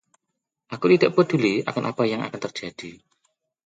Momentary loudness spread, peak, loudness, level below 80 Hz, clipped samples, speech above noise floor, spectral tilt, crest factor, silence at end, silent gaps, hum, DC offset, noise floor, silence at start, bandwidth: 20 LU; -4 dBFS; -22 LUFS; -66 dBFS; under 0.1%; 59 dB; -6.5 dB/octave; 20 dB; 0.7 s; none; none; under 0.1%; -82 dBFS; 0.7 s; 7.8 kHz